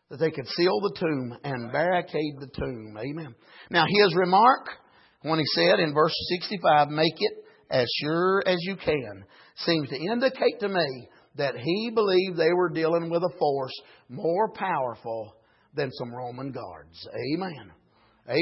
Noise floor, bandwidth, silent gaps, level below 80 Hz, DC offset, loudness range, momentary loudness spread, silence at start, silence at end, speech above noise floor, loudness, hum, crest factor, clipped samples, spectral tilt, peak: -51 dBFS; 6 kHz; none; -60 dBFS; under 0.1%; 8 LU; 15 LU; 0.1 s; 0 s; 25 dB; -25 LUFS; none; 20 dB; under 0.1%; -8.5 dB/octave; -6 dBFS